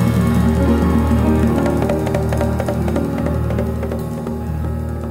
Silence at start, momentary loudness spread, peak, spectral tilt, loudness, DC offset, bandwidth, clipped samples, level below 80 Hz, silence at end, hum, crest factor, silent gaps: 0 s; 8 LU; -4 dBFS; -8 dB/octave; -18 LUFS; under 0.1%; 16 kHz; under 0.1%; -24 dBFS; 0 s; none; 14 dB; none